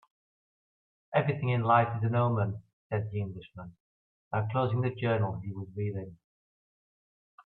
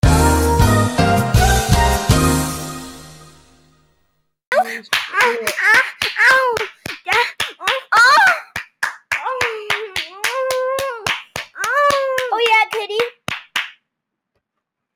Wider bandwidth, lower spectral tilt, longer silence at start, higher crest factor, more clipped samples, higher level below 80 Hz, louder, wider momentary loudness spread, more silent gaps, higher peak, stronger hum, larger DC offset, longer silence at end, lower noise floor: second, 4.2 kHz vs 19 kHz; first, -11 dB/octave vs -4 dB/octave; first, 1.1 s vs 0.05 s; about the same, 20 dB vs 16 dB; neither; second, -66 dBFS vs -28 dBFS; second, -30 LUFS vs -16 LUFS; first, 19 LU vs 12 LU; first, 2.73-2.90 s, 3.80-4.31 s vs 4.47-4.51 s; second, -12 dBFS vs 0 dBFS; neither; neither; about the same, 1.3 s vs 1.25 s; first, under -90 dBFS vs -78 dBFS